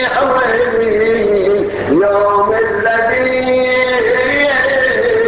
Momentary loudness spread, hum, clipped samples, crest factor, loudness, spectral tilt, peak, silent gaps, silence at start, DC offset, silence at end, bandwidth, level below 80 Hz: 2 LU; none; under 0.1%; 10 dB; -12 LUFS; -8.5 dB/octave; -2 dBFS; none; 0 s; under 0.1%; 0 s; 4 kHz; -42 dBFS